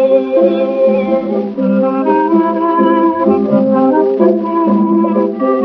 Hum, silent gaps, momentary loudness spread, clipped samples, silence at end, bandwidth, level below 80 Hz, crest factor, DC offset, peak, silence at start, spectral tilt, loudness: none; none; 3 LU; under 0.1%; 0 s; 5.4 kHz; -56 dBFS; 12 dB; under 0.1%; 0 dBFS; 0 s; -7.5 dB/octave; -12 LUFS